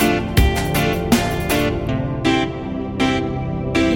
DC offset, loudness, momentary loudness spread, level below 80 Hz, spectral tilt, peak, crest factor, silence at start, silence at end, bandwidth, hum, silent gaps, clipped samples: under 0.1%; -19 LUFS; 6 LU; -28 dBFS; -5.5 dB/octave; -2 dBFS; 18 dB; 0 s; 0 s; 17 kHz; none; none; under 0.1%